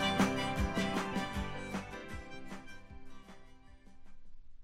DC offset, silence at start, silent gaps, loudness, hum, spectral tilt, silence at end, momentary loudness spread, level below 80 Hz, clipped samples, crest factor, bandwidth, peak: under 0.1%; 0 s; none; -37 LUFS; none; -5 dB/octave; 0 s; 24 LU; -48 dBFS; under 0.1%; 22 dB; 16 kHz; -16 dBFS